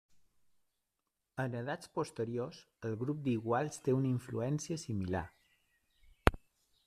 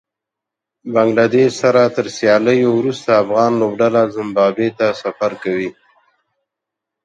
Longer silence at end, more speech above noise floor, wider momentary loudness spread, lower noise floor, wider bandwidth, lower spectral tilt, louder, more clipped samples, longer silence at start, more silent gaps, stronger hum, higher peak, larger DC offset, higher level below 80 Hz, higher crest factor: second, 0.5 s vs 1.35 s; second, 50 dB vs 69 dB; about the same, 8 LU vs 8 LU; first, -87 dBFS vs -83 dBFS; first, 14.5 kHz vs 9 kHz; about the same, -6.5 dB/octave vs -6 dB/octave; second, -37 LUFS vs -15 LUFS; neither; first, 1.35 s vs 0.85 s; neither; neither; about the same, -2 dBFS vs 0 dBFS; neither; first, -50 dBFS vs -62 dBFS; first, 36 dB vs 16 dB